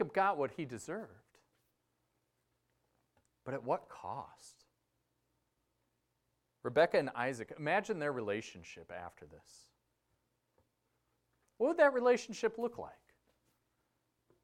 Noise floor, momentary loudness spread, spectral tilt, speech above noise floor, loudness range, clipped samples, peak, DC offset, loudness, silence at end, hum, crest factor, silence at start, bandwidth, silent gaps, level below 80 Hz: -82 dBFS; 20 LU; -5 dB/octave; 47 dB; 11 LU; under 0.1%; -14 dBFS; under 0.1%; -35 LUFS; 1.5 s; none; 24 dB; 0 s; 12.5 kHz; none; -78 dBFS